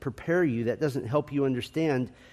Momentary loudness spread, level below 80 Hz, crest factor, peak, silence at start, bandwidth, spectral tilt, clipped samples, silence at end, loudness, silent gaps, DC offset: 4 LU; -60 dBFS; 16 dB; -12 dBFS; 0 s; 14.5 kHz; -7.5 dB/octave; under 0.1%; 0.2 s; -28 LUFS; none; under 0.1%